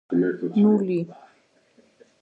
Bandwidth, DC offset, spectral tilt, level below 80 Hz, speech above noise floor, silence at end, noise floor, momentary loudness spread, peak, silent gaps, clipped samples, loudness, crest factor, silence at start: 4.6 kHz; under 0.1%; -10 dB/octave; -72 dBFS; 39 dB; 1.1 s; -61 dBFS; 9 LU; -8 dBFS; none; under 0.1%; -22 LUFS; 16 dB; 0.1 s